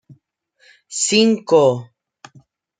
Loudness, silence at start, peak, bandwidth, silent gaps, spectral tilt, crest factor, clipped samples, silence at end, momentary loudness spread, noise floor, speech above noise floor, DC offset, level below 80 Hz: -16 LUFS; 0.9 s; -2 dBFS; 9.6 kHz; none; -3.5 dB/octave; 18 dB; under 0.1%; 0.95 s; 13 LU; -61 dBFS; 44 dB; under 0.1%; -66 dBFS